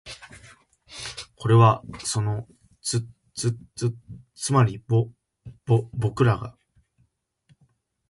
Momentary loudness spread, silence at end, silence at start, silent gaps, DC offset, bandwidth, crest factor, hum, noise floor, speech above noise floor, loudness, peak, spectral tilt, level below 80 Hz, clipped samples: 21 LU; 1.6 s; 0.05 s; none; under 0.1%; 11.5 kHz; 20 dB; none; -68 dBFS; 45 dB; -24 LUFS; -4 dBFS; -6 dB/octave; -54 dBFS; under 0.1%